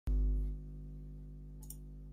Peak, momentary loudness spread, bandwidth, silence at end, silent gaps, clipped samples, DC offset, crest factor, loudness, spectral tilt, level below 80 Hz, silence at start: -26 dBFS; 15 LU; 15 kHz; 0 s; none; under 0.1%; under 0.1%; 12 dB; -43 LUFS; -7.5 dB/octave; -38 dBFS; 0.05 s